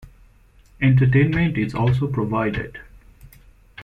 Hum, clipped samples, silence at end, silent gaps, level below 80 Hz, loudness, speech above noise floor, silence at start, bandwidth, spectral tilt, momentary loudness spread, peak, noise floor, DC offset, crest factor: none; under 0.1%; 0 s; none; -42 dBFS; -20 LUFS; 33 dB; 0.05 s; 4.9 kHz; -9 dB/octave; 13 LU; -6 dBFS; -52 dBFS; under 0.1%; 16 dB